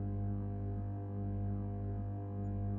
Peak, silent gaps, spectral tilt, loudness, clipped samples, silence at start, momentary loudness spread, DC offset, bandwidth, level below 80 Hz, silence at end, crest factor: -28 dBFS; none; -12.5 dB/octave; -40 LUFS; under 0.1%; 0 s; 2 LU; under 0.1%; 2.5 kHz; -48 dBFS; 0 s; 10 dB